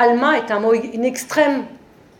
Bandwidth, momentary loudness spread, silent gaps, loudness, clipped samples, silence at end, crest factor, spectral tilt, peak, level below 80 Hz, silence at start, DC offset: 17 kHz; 7 LU; none; -18 LUFS; under 0.1%; 0.4 s; 16 dB; -4 dB/octave; -2 dBFS; -64 dBFS; 0 s; under 0.1%